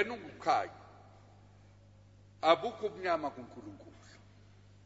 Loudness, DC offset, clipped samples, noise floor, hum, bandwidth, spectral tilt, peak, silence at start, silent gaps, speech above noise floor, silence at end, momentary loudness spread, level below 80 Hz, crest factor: -33 LUFS; under 0.1%; under 0.1%; -59 dBFS; 50 Hz at -60 dBFS; 7.6 kHz; -2.5 dB/octave; -12 dBFS; 0 s; none; 26 dB; 0.95 s; 25 LU; -70 dBFS; 26 dB